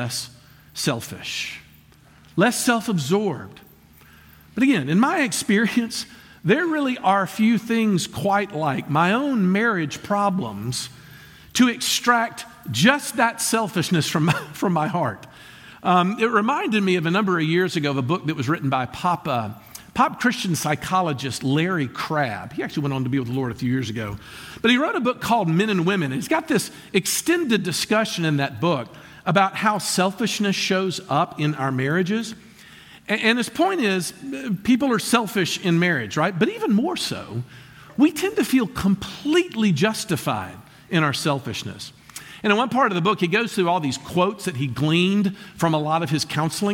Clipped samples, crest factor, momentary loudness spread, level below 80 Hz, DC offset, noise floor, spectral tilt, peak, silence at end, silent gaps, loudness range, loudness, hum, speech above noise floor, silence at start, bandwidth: under 0.1%; 20 dB; 10 LU; -56 dBFS; under 0.1%; -51 dBFS; -4.5 dB/octave; -2 dBFS; 0 s; none; 3 LU; -22 LUFS; none; 30 dB; 0 s; 17 kHz